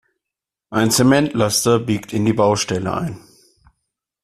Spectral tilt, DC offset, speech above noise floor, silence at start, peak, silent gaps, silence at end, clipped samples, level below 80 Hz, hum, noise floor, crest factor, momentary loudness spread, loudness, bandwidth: -4.5 dB/octave; under 0.1%; 68 dB; 0.7 s; -2 dBFS; none; 1.05 s; under 0.1%; -52 dBFS; none; -85 dBFS; 16 dB; 11 LU; -17 LUFS; 14.5 kHz